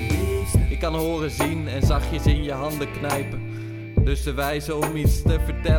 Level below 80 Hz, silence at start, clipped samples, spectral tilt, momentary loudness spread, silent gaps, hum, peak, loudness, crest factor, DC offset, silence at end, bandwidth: -26 dBFS; 0 s; under 0.1%; -6 dB/octave; 5 LU; none; none; -6 dBFS; -24 LUFS; 16 dB; under 0.1%; 0 s; 20 kHz